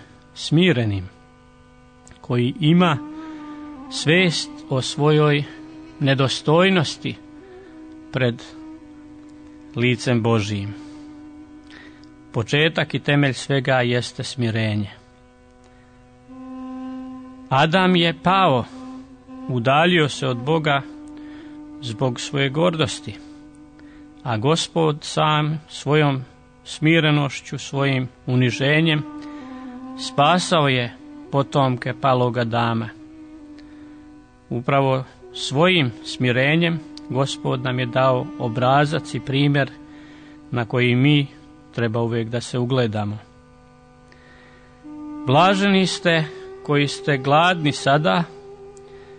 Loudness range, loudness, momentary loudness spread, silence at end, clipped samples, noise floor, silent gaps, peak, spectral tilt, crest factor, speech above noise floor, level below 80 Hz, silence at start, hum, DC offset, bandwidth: 6 LU; -20 LUFS; 21 LU; 0 s; under 0.1%; -50 dBFS; none; -4 dBFS; -5.5 dB/octave; 16 dB; 31 dB; -56 dBFS; 0 s; none; under 0.1%; 9.6 kHz